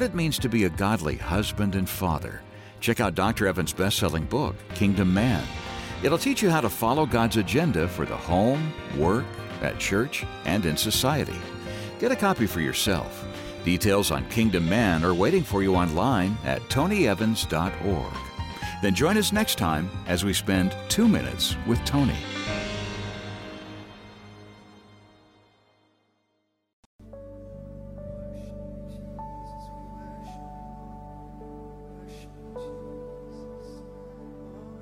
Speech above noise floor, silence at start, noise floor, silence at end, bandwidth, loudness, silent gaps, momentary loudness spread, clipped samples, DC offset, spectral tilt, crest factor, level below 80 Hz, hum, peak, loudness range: 50 dB; 0 s; -74 dBFS; 0 s; 17 kHz; -25 LUFS; 26.73-26.99 s; 20 LU; under 0.1%; under 0.1%; -5 dB/octave; 16 dB; -42 dBFS; none; -12 dBFS; 18 LU